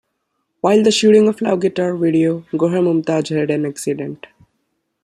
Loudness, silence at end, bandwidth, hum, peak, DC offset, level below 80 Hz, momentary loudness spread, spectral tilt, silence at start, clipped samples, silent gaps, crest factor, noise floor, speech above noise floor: -16 LUFS; 0.9 s; 12.5 kHz; none; -2 dBFS; under 0.1%; -62 dBFS; 11 LU; -5.5 dB/octave; 0.65 s; under 0.1%; none; 14 dB; -71 dBFS; 56 dB